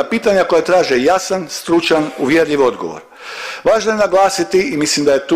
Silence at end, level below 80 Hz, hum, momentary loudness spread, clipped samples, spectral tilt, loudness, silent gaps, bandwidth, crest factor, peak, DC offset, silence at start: 0 s; -50 dBFS; none; 13 LU; under 0.1%; -3.5 dB/octave; -14 LUFS; none; 15.5 kHz; 12 dB; -4 dBFS; under 0.1%; 0 s